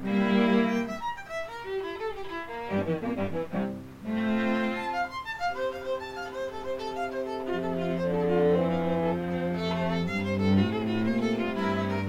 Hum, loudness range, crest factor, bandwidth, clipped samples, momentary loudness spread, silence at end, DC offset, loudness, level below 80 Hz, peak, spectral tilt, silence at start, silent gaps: none; 5 LU; 16 dB; 15.5 kHz; under 0.1%; 11 LU; 0 s; under 0.1%; -29 LUFS; -56 dBFS; -12 dBFS; -7 dB/octave; 0 s; none